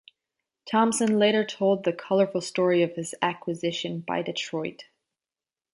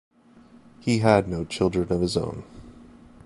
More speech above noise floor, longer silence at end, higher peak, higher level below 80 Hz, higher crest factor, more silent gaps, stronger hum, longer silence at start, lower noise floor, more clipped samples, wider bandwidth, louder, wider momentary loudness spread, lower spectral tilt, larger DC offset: first, over 65 dB vs 30 dB; first, 0.9 s vs 0.45 s; second, -8 dBFS vs -4 dBFS; second, -74 dBFS vs -46 dBFS; about the same, 18 dB vs 22 dB; neither; neither; second, 0.65 s vs 0.85 s; first, under -90 dBFS vs -52 dBFS; neither; about the same, 11.5 kHz vs 11.5 kHz; about the same, -25 LUFS vs -24 LUFS; second, 8 LU vs 15 LU; second, -4.5 dB/octave vs -6 dB/octave; neither